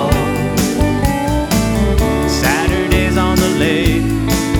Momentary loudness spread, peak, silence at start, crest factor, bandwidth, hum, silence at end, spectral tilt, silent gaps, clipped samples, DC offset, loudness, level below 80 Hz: 2 LU; 0 dBFS; 0 s; 14 dB; over 20 kHz; none; 0 s; -5 dB/octave; none; under 0.1%; under 0.1%; -15 LUFS; -22 dBFS